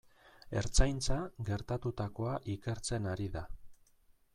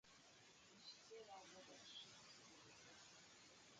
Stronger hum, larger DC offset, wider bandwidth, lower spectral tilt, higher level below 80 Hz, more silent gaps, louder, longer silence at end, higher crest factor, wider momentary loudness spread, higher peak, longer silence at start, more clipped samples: neither; neither; first, 12 kHz vs 9 kHz; first, -5 dB/octave vs -1.5 dB/octave; first, -40 dBFS vs under -90 dBFS; neither; first, -37 LUFS vs -62 LUFS; first, 0.6 s vs 0 s; first, 22 dB vs 16 dB; about the same, 8 LU vs 8 LU; first, -12 dBFS vs -48 dBFS; first, 0.45 s vs 0.05 s; neither